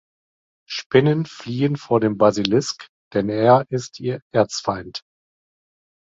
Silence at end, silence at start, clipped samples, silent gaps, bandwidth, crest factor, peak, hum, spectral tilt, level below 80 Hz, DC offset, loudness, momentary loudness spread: 1.1 s; 0.7 s; under 0.1%; 0.86-0.90 s, 2.89-3.11 s, 4.22-4.31 s; 8 kHz; 20 dB; -2 dBFS; none; -6 dB/octave; -56 dBFS; under 0.1%; -20 LUFS; 14 LU